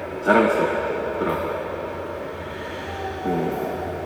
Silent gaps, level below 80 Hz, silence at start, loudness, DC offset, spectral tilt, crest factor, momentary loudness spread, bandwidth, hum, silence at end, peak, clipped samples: none; -50 dBFS; 0 s; -24 LUFS; under 0.1%; -6.5 dB/octave; 22 dB; 13 LU; 19.5 kHz; none; 0 s; -2 dBFS; under 0.1%